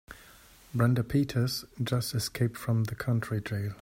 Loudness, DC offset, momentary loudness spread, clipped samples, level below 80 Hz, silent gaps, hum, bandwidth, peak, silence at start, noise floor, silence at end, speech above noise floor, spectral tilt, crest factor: -30 LUFS; under 0.1%; 7 LU; under 0.1%; -56 dBFS; none; none; 16.5 kHz; -12 dBFS; 0.1 s; -55 dBFS; 0 s; 26 dB; -6 dB/octave; 18 dB